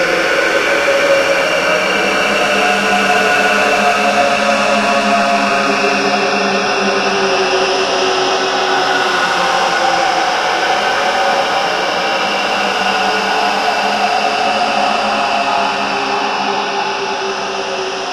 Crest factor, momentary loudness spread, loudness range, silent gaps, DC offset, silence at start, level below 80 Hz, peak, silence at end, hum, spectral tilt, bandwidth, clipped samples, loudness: 14 dB; 4 LU; 2 LU; none; under 0.1%; 0 s; -50 dBFS; 0 dBFS; 0 s; none; -2.5 dB/octave; 15 kHz; under 0.1%; -13 LUFS